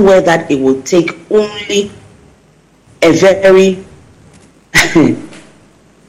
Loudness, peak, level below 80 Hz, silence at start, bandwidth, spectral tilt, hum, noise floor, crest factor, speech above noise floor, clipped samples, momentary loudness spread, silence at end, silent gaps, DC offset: -10 LUFS; 0 dBFS; -42 dBFS; 0 s; 16 kHz; -4.5 dB/octave; none; -47 dBFS; 12 dB; 38 dB; under 0.1%; 8 LU; 0.7 s; none; under 0.1%